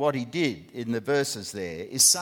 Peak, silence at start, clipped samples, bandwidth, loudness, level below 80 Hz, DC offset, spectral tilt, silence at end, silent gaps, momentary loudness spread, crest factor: -6 dBFS; 0 s; under 0.1%; 18.5 kHz; -26 LUFS; -64 dBFS; under 0.1%; -2.5 dB/octave; 0 s; none; 14 LU; 20 dB